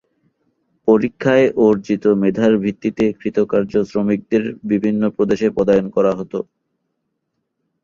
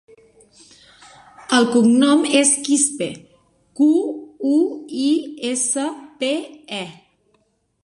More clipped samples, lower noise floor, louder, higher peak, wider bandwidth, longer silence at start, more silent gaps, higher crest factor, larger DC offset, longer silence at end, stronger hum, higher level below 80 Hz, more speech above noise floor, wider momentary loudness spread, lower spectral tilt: neither; first, -73 dBFS vs -65 dBFS; about the same, -17 LUFS vs -18 LUFS; about the same, -2 dBFS vs -2 dBFS; second, 7.2 kHz vs 11.5 kHz; second, 0.85 s vs 1.4 s; neither; about the same, 16 dB vs 18 dB; neither; first, 1.4 s vs 0.9 s; neither; first, -52 dBFS vs -68 dBFS; first, 57 dB vs 47 dB; second, 6 LU vs 15 LU; first, -8 dB/octave vs -2.5 dB/octave